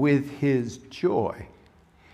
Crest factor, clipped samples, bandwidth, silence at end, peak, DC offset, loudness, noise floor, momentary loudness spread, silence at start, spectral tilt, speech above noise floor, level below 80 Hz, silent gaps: 16 dB; under 0.1%; 11.5 kHz; 0.65 s; -10 dBFS; under 0.1%; -26 LUFS; -56 dBFS; 15 LU; 0 s; -7.5 dB/octave; 31 dB; -58 dBFS; none